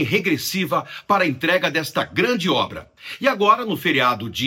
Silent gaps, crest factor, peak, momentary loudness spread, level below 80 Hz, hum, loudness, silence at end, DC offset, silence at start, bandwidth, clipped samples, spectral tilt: none; 18 dB; -2 dBFS; 6 LU; -58 dBFS; none; -20 LUFS; 0 s; under 0.1%; 0 s; 17 kHz; under 0.1%; -4.5 dB/octave